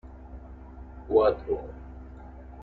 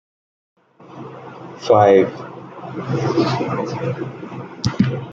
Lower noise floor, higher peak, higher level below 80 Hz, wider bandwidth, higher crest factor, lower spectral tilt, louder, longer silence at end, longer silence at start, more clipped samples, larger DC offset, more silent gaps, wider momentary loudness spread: first, -44 dBFS vs -38 dBFS; second, -8 dBFS vs 0 dBFS; first, -44 dBFS vs -54 dBFS; second, 4.5 kHz vs 7.6 kHz; about the same, 22 dB vs 20 dB; first, -9.5 dB/octave vs -7 dB/octave; second, -26 LUFS vs -18 LUFS; about the same, 0 s vs 0 s; second, 0.05 s vs 0.8 s; neither; neither; neither; about the same, 23 LU vs 22 LU